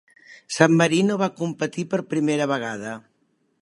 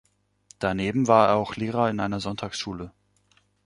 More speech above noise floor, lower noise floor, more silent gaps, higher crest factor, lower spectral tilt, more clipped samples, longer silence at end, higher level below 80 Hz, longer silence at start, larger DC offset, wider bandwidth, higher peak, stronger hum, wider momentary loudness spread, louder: first, 46 dB vs 41 dB; about the same, -68 dBFS vs -65 dBFS; neither; about the same, 22 dB vs 22 dB; about the same, -5.5 dB/octave vs -6 dB/octave; neither; about the same, 0.65 s vs 0.75 s; second, -70 dBFS vs -54 dBFS; second, 0.3 s vs 0.6 s; neither; about the same, 11.5 kHz vs 11.5 kHz; first, 0 dBFS vs -4 dBFS; second, none vs 50 Hz at -45 dBFS; about the same, 15 LU vs 14 LU; about the same, -22 LUFS vs -24 LUFS